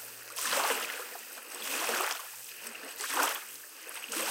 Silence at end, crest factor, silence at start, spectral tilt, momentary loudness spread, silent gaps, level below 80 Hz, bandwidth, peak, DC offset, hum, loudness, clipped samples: 0 s; 22 dB; 0 s; 1.5 dB/octave; 13 LU; none; under -90 dBFS; 17 kHz; -14 dBFS; under 0.1%; none; -34 LUFS; under 0.1%